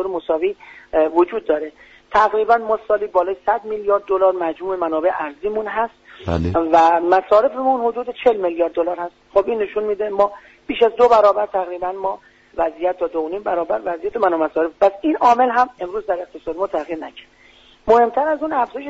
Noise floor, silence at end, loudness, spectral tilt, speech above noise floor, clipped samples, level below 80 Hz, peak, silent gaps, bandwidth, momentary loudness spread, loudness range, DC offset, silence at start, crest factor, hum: -49 dBFS; 0 s; -18 LUFS; -4 dB/octave; 31 dB; under 0.1%; -46 dBFS; -4 dBFS; none; 8 kHz; 11 LU; 3 LU; under 0.1%; 0 s; 16 dB; none